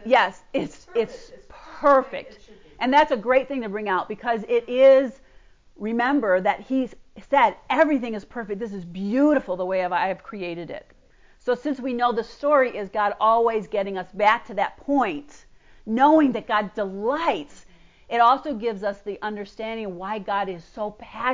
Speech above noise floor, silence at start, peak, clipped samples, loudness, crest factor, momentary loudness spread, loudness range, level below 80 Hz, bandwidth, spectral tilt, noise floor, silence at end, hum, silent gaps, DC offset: 31 dB; 0 s; -6 dBFS; under 0.1%; -23 LUFS; 16 dB; 14 LU; 4 LU; -56 dBFS; 7.6 kHz; -6 dB/octave; -53 dBFS; 0 s; none; none; under 0.1%